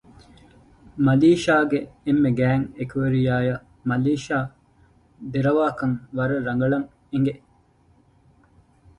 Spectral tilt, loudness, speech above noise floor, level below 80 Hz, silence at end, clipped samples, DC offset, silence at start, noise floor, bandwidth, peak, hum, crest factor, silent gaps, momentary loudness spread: -7.5 dB/octave; -22 LUFS; 37 dB; -52 dBFS; 1.6 s; under 0.1%; under 0.1%; 0.95 s; -58 dBFS; 11 kHz; -6 dBFS; none; 16 dB; none; 12 LU